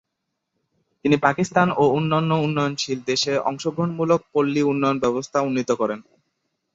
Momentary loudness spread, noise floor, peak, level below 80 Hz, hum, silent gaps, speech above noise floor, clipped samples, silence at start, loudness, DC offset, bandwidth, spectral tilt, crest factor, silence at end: 6 LU; -79 dBFS; -2 dBFS; -62 dBFS; none; none; 58 dB; under 0.1%; 1.05 s; -21 LUFS; under 0.1%; 8 kHz; -5.5 dB/octave; 20 dB; 0.75 s